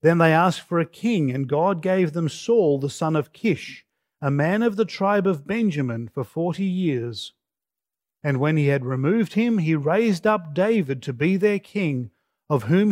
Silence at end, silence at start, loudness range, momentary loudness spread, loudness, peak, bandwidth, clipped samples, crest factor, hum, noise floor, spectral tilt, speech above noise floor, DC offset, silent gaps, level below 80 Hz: 0 s; 0.05 s; 4 LU; 8 LU; -22 LUFS; -4 dBFS; 15.5 kHz; under 0.1%; 18 dB; none; -89 dBFS; -7.5 dB/octave; 68 dB; under 0.1%; none; -68 dBFS